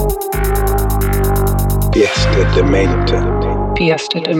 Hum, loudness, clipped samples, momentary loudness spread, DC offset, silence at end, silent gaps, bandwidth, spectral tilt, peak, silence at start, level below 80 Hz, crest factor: 50 Hz at -25 dBFS; -14 LUFS; under 0.1%; 4 LU; under 0.1%; 0 s; none; 18.5 kHz; -5.5 dB/octave; -2 dBFS; 0 s; -18 dBFS; 12 dB